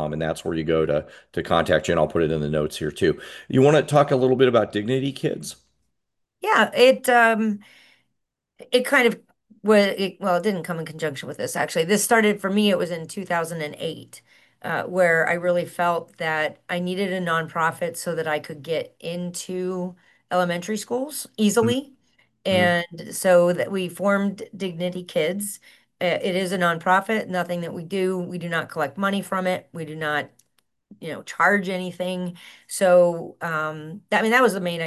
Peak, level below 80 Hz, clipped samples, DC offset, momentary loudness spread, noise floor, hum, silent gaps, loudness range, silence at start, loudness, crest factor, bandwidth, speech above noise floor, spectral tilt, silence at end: -4 dBFS; -54 dBFS; under 0.1%; under 0.1%; 13 LU; -79 dBFS; none; none; 6 LU; 0 s; -22 LUFS; 20 dB; 12.5 kHz; 57 dB; -4.5 dB/octave; 0 s